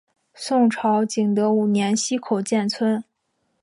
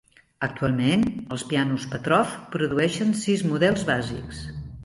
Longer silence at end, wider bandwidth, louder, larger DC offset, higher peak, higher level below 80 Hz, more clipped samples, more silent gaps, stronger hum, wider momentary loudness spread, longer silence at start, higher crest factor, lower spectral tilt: first, 0.6 s vs 0 s; about the same, 11.5 kHz vs 11.5 kHz; first, -21 LUFS vs -24 LUFS; neither; about the same, -8 dBFS vs -6 dBFS; second, -74 dBFS vs -48 dBFS; neither; neither; neither; second, 5 LU vs 11 LU; about the same, 0.4 s vs 0.4 s; about the same, 14 dB vs 18 dB; about the same, -5 dB/octave vs -5.5 dB/octave